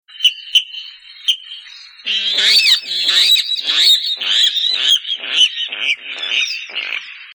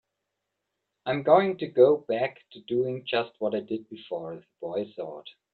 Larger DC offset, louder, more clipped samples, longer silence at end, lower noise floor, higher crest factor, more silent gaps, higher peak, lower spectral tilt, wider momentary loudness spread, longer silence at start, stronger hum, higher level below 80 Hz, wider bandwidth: neither; first, -13 LUFS vs -27 LUFS; neither; second, 0 s vs 0.25 s; second, -37 dBFS vs -83 dBFS; second, 16 dB vs 22 dB; neither; first, -2 dBFS vs -6 dBFS; second, 3.5 dB/octave vs -9 dB/octave; second, 14 LU vs 18 LU; second, 0.15 s vs 1.05 s; neither; about the same, -70 dBFS vs -72 dBFS; first, 19.5 kHz vs 4.5 kHz